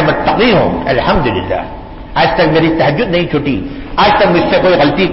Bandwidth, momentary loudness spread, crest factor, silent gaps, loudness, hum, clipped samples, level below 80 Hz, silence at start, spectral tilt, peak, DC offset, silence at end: 5.8 kHz; 10 LU; 10 dB; none; -11 LUFS; none; under 0.1%; -28 dBFS; 0 s; -10 dB/octave; -2 dBFS; under 0.1%; 0 s